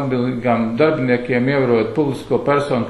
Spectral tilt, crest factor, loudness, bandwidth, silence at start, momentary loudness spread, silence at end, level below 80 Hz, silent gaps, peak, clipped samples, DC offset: -8 dB/octave; 14 dB; -17 LUFS; 12 kHz; 0 s; 4 LU; 0 s; -50 dBFS; none; -2 dBFS; under 0.1%; under 0.1%